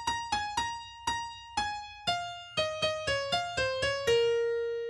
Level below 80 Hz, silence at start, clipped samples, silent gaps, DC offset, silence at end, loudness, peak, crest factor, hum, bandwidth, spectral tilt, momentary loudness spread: -56 dBFS; 0 s; under 0.1%; none; under 0.1%; 0 s; -31 LUFS; -16 dBFS; 16 dB; none; 13 kHz; -2 dB/octave; 8 LU